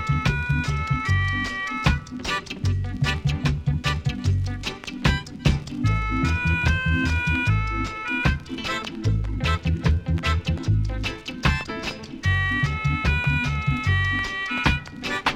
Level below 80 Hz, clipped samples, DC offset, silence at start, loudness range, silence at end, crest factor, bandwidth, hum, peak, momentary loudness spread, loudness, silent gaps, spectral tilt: -30 dBFS; under 0.1%; under 0.1%; 0 s; 2 LU; 0 s; 18 dB; 13 kHz; none; -6 dBFS; 6 LU; -24 LUFS; none; -5.5 dB/octave